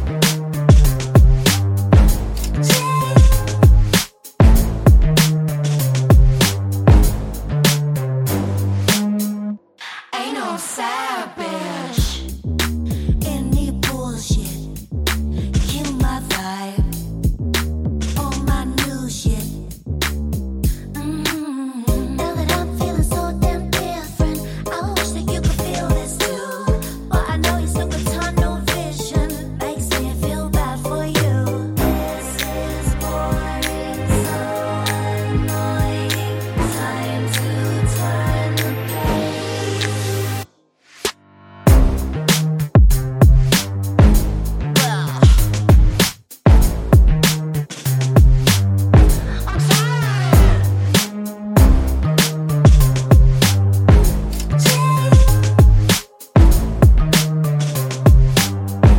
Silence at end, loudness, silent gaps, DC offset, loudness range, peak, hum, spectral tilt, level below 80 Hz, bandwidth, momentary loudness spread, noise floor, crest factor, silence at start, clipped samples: 0 s; -17 LUFS; none; under 0.1%; 7 LU; 0 dBFS; none; -5.5 dB/octave; -20 dBFS; 17 kHz; 10 LU; -52 dBFS; 16 dB; 0 s; under 0.1%